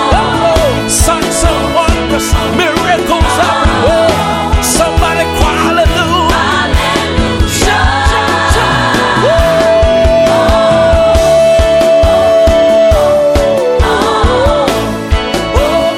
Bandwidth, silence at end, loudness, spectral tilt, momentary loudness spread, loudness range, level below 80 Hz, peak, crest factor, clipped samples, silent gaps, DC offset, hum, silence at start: 16.5 kHz; 0 s; -9 LUFS; -4.5 dB/octave; 4 LU; 3 LU; -18 dBFS; 0 dBFS; 8 dB; under 0.1%; none; under 0.1%; none; 0 s